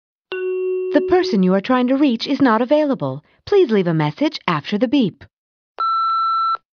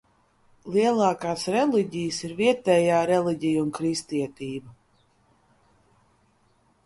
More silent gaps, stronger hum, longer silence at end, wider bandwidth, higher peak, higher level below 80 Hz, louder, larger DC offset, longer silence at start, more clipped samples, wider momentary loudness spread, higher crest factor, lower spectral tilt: first, 5.33-5.75 s vs none; neither; second, 0.2 s vs 2.15 s; second, 6.8 kHz vs 11.5 kHz; first, 0 dBFS vs -8 dBFS; first, -58 dBFS vs -64 dBFS; first, -18 LUFS vs -24 LUFS; neither; second, 0.3 s vs 0.65 s; neither; second, 8 LU vs 11 LU; about the same, 18 dB vs 18 dB; first, -7.5 dB/octave vs -5.5 dB/octave